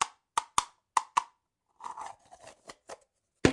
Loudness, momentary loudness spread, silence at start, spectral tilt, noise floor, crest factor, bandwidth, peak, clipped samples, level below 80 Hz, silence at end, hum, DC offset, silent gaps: -33 LUFS; 21 LU; 0 s; -3.5 dB/octave; -75 dBFS; 28 dB; 11.5 kHz; -6 dBFS; under 0.1%; -56 dBFS; 0 s; none; under 0.1%; none